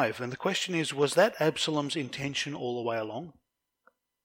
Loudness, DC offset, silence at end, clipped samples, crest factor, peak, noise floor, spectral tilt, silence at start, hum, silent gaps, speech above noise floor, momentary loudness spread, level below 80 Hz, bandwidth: -29 LUFS; under 0.1%; 0.95 s; under 0.1%; 20 dB; -10 dBFS; -69 dBFS; -4 dB/octave; 0 s; none; none; 39 dB; 10 LU; -72 dBFS; 17 kHz